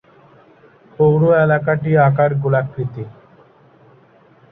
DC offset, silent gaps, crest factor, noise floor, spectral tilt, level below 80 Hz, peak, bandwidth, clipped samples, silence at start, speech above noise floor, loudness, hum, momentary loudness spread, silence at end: under 0.1%; none; 16 dB; -50 dBFS; -12 dB/octave; -54 dBFS; -2 dBFS; 3.8 kHz; under 0.1%; 1 s; 35 dB; -16 LUFS; none; 13 LU; 1.4 s